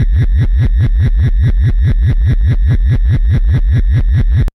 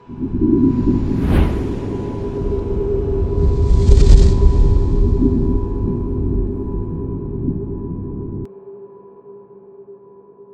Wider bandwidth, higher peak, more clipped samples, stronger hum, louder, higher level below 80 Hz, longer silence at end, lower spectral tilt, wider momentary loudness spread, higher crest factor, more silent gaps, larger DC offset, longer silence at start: second, 5.8 kHz vs 8.6 kHz; second, -4 dBFS vs 0 dBFS; second, under 0.1% vs 0.2%; neither; first, -13 LUFS vs -18 LUFS; first, -12 dBFS vs -18 dBFS; about the same, 0.05 s vs 0.1 s; about the same, -9 dB/octave vs -9 dB/octave; second, 0 LU vs 14 LU; second, 6 dB vs 16 dB; neither; neither; about the same, 0 s vs 0.1 s